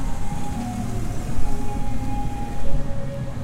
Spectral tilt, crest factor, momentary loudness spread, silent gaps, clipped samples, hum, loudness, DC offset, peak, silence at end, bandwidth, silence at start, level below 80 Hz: -6.5 dB/octave; 12 dB; 2 LU; none; under 0.1%; none; -29 LUFS; under 0.1%; -6 dBFS; 0 s; 11.5 kHz; 0 s; -28 dBFS